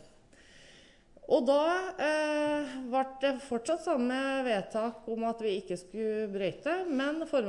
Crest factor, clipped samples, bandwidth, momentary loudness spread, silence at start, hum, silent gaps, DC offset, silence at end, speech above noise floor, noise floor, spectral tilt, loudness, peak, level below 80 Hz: 18 dB; under 0.1%; 11 kHz; 7 LU; 0.55 s; none; none; under 0.1%; 0 s; 27 dB; -58 dBFS; -4.5 dB/octave; -31 LUFS; -14 dBFS; -66 dBFS